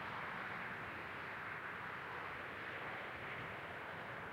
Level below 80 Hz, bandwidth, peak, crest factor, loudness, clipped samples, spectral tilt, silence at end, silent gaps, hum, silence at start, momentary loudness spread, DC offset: -74 dBFS; 16 kHz; -34 dBFS; 12 dB; -46 LUFS; under 0.1%; -5 dB/octave; 0 s; none; none; 0 s; 3 LU; under 0.1%